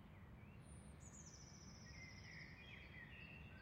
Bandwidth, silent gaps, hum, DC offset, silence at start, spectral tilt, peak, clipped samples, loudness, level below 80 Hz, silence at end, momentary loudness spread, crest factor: 16 kHz; none; none; under 0.1%; 0 s; -4 dB/octave; -46 dBFS; under 0.1%; -59 LUFS; -68 dBFS; 0 s; 4 LU; 12 dB